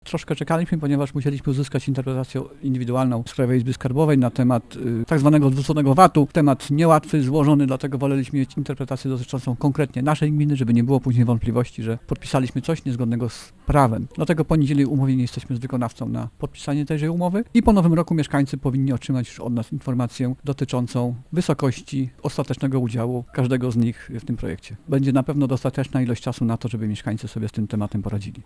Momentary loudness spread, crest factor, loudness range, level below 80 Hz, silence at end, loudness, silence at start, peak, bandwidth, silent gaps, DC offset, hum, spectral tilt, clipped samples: 10 LU; 20 dB; 6 LU; -42 dBFS; 0.05 s; -22 LUFS; 0.05 s; 0 dBFS; 11 kHz; none; under 0.1%; none; -7.5 dB/octave; under 0.1%